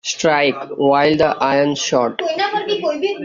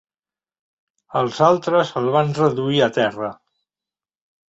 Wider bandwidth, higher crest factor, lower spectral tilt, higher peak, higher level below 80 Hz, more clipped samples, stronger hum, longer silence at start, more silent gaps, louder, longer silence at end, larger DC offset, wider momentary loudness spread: about the same, 7.6 kHz vs 8 kHz; about the same, 16 dB vs 20 dB; second, -4 dB/octave vs -6 dB/octave; about the same, -2 dBFS vs -2 dBFS; first, -54 dBFS vs -62 dBFS; neither; neither; second, 0.05 s vs 1.1 s; neither; about the same, -17 LUFS vs -19 LUFS; second, 0 s vs 1.15 s; neither; second, 6 LU vs 9 LU